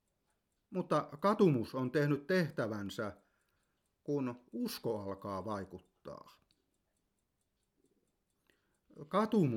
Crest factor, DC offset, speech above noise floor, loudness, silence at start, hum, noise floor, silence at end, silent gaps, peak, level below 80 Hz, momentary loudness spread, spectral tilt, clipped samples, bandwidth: 20 dB; under 0.1%; 48 dB; -36 LUFS; 0.7 s; none; -83 dBFS; 0 s; none; -16 dBFS; -76 dBFS; 21 LU; -7 dB/octave; under 0.1%; 17.5 kHz